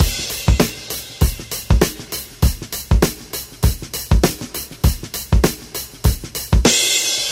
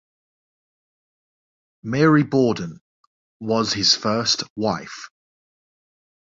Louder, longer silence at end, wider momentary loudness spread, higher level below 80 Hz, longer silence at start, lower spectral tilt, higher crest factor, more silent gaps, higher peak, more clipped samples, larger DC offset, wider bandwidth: about the same, -19 LUFS vs -20 LUFS; second, 0 s vs 1.3 s; second, 13 LU vs 18 LU; first, -22 dBFS vs -58 dBFS; second, 0 s vs 1.85 s; about the same, -4 dB/octave vs -4.5 dB/octave; about the same, 18 dB vs 20 dB; second, none vs 2.81-3.40 s, 4.50-4.56 s; first, 0 dBFS vs -4 dBFS; neither; neither; first, 16.5 kHz vs 7.8 kHz